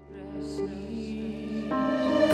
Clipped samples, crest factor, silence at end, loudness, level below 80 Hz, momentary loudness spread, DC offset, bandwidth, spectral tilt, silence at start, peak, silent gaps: under 0.1%; 20 dB; 0 s; -31 LUFS; -50 dBFS; 11 LU; under 0.1%; 11.5 kHz; -6 dB/octave; 0 s; -10 dBFS; none